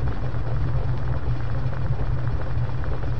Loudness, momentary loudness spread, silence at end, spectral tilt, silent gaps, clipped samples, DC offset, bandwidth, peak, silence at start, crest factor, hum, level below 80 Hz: -27 LUFS; 2 LU; 0 s; -9 dB/octave; none; under 0.1%; 7%; 6 kHz; -10 dBFS; 0 s; 12 dB; none; -30 dBFS